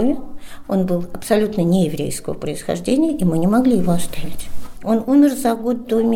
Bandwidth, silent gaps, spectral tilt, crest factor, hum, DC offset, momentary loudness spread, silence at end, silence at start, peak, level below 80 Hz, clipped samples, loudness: 17 kHz; none; -6.5 dB/octave; 14 dB; none; under 0.1%; 15 LU; 0 s; 0 s; -2 dBFS; -38 dBFS; under 0.1%; -18 LUFS